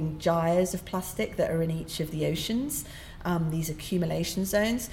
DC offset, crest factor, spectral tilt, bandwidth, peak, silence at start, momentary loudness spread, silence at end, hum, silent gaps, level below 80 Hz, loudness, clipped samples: under 0.1%; 16 dB; -5 dB/octave; 17 kHz; -14 dBFS; 0 s; 7 LU; 0 s; none; none; -46 dBFS; -29 LUFS; under 0.1%